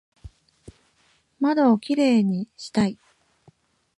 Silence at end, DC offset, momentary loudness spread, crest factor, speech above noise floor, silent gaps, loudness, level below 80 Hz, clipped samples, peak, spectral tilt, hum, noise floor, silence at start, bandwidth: 1.05 s; under 0.1%; 9 LU; 18 dB; 43 dB; none; -22 LUFS; -56 dBFS; under 0.1%; -8 dBFS; -6.5 dB/octave; none; -64 dBFS; 0.25 s; 11.5 kHz